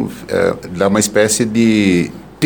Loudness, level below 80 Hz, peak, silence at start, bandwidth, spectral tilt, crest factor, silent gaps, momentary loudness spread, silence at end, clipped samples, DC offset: -14 LUFS; -46 dBFS; 0 dBFS; 0 s; 19.5 kHz; -4.5 dB/octave; 14 dB; none; 6 LU; 0 s; under 0.1%; 0.2%